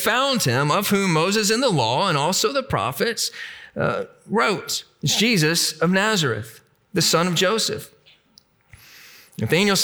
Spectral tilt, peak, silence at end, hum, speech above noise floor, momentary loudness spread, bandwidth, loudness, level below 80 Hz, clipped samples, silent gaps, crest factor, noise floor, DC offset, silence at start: -3.5 dB/octave; -6 dBFS; 0 s; none; 36 dB; 10 LU; over 20 kHz; -20 LUFS; -60 dBFS; under 0.1%; none; 16 dB; -57 dBFS; under 0.1%; 0 s